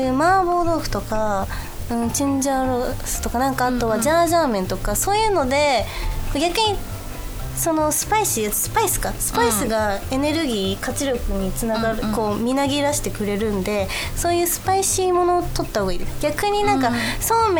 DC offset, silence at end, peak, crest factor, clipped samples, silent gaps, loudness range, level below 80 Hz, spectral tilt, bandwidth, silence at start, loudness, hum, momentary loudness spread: under 0.1%; 0 s; -6 dBFS; 14 dB; under 0.1%; none; 2 LU; -32 dBFS; -4 dB/octave; over 20 kHz; 0 s; -20 LUFS; none; 7 LU